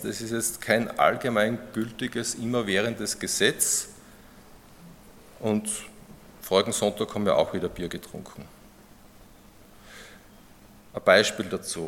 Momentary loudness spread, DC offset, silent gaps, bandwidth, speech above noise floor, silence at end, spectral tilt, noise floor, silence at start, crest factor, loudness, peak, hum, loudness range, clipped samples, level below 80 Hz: 20 LU; under 0.1%; none; 17.5 kHz; 26 dB; 0 s; -3 dB/octave; -52 dBFS; 0 s; 24 dB; -25 LUFS; -4 dBFS; none; 7 LU; under 0.1%; -58 dBFS